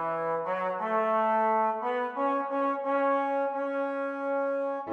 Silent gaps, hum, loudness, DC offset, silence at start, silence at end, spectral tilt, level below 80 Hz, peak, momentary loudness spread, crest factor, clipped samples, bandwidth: none; none; -29 LUFS; under 0.1%; 0 s; 0 s; -7 dB/octave; -90 dBFS; -16 dBFS; 5 LU; 12 dB; under 0.1%; 6.4 kHz